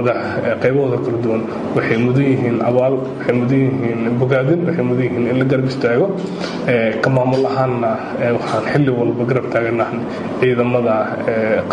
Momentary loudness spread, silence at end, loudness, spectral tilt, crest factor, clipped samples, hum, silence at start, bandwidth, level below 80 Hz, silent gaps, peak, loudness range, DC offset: 4 LU; 0 s; -17 LUFS; -8 dB/octave; 14 dB; under 0.1%; none; 0 s; 9.6 kHz; -52 dBFS; none; -2 dBFS; 1 LU; under 0.1%